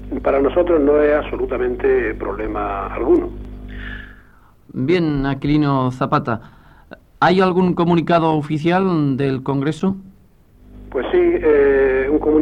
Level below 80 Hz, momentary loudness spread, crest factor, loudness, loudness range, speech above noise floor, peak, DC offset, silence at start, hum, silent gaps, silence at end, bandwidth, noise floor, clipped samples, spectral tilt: -36 dBFS; 13 LU; 14 dB; -17 LUFS; 4 LU; 33 dB; -4 dBFS; under 0.1%; 0 s; none; none; 0 s; 9.2 kHz; -49 dBFS; under 0.1%; -8.5 dB/octave